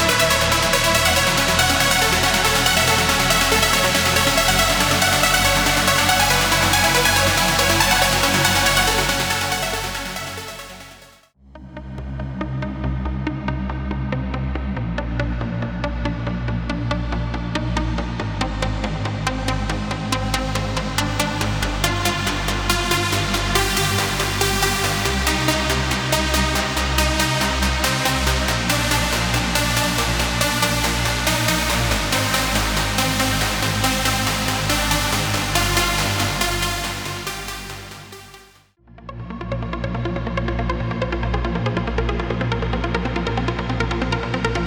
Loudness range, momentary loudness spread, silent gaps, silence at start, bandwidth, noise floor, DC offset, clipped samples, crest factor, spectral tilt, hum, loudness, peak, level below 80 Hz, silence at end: 11 LU; 11 LU; none; 0 s; over 20 kHz; -50 dBFS; under 0.1%; under 0.1%; 18 dB; -3 dB/octave; none; -19 LUFS; -2 dBFS; -30 dBFS; 0 s